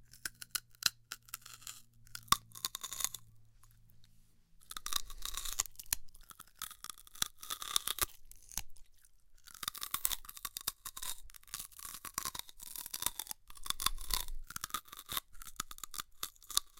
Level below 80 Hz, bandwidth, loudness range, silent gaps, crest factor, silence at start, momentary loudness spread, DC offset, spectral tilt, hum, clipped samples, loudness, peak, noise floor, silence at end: -54 dBFS; 17 kHz; 3 LU; none; 38 dB; 0 s; 14 LU; under 0.1%; 0.5 dB/octave; none; under 0.1%; -39 LUFS; -4 dBFS; -63 dBFS; 0 s